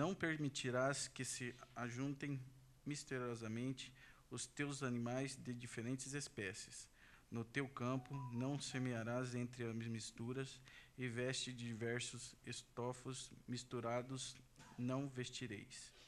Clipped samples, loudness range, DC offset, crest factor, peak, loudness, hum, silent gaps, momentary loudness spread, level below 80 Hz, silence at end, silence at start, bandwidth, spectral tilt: under 0.1%; 2 LU; under 0.1%; 20 dB; -26 dBFS; -46 LUFS; none; none; 10 LU; -74 dBFS; 0 s; 0 s; 13 kHz; -4.5 dB/octave